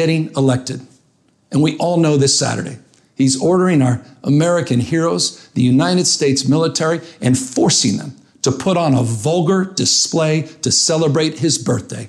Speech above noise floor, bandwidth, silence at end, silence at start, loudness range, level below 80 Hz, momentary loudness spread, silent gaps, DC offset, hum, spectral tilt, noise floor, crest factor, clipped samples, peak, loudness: 42 dB; 12.5 kHz; 0 s; 0 s; 1 LU; -54 dBFS; 7 LU; none; under 0.1%; none; -4.5 dB/octave; -58 dBFS; 12 dB; under 0.1%; -4 dBFS; -15 LUFS